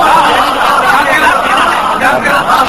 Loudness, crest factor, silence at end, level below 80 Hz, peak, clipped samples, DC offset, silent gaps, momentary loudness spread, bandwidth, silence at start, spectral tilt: -8 LUFS; 8 dB; 0 s; -36 dBFS; 0 dBFS; 0.8%; 1%; none; 3 LU; 17 kHz; 0 s; -2.5 dB/octave